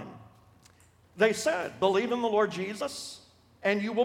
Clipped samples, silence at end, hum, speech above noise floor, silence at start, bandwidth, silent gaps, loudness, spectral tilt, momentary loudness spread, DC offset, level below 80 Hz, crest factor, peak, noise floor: under 0.1%; 0 s; none; 32 dB; 0 s; 16 kHz; none; -29 LUFS; -4 dB/octave; 14 LU; under 0.1%; -70 dBFS; 20 dB; -10 dBFS; -60 dBFS